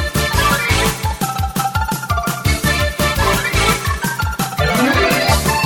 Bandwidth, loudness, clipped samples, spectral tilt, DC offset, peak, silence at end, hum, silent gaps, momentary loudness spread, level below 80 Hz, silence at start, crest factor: 18 kHz; -16 LUFS; under 0.1%; -4 dB/octave; under 0.1%; -2 dBFS; 0 s; none; none; 6 LU; -26 dBFS; 0 s; 14 dB